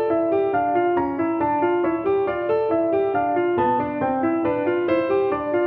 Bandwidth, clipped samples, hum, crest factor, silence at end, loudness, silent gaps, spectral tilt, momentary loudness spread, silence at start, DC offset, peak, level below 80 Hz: 4.6 kHz; under 0.1%; none; 12 dB; 0 s; -21 LUFS; none; -10 dB/octave; 2 LU; 0 s; under 0.1%; -8 dBFS; -54 dBFS